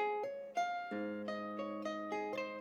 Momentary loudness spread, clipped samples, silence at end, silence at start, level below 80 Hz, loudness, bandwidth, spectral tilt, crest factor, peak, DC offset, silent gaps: 3 LU; under 0.1%; 0 s; 0 s; -88 dBFS; -41 LUFS; 15 kHz; -5 dB/octave; 14 dB; -26 dBFS; under 0.1%; none